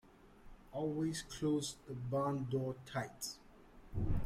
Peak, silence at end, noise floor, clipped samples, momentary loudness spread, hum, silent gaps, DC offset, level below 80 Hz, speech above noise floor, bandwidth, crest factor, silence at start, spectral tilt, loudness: -24 dBFS; 0 s; -59 dBFS; under 0.1%; 9 LU; none; none; under 0.1%; -50 dBFS; 21 dB; 15.5 kHz; 16 dB; 0.05 s; -5.5 dB/octave; -40 LUFS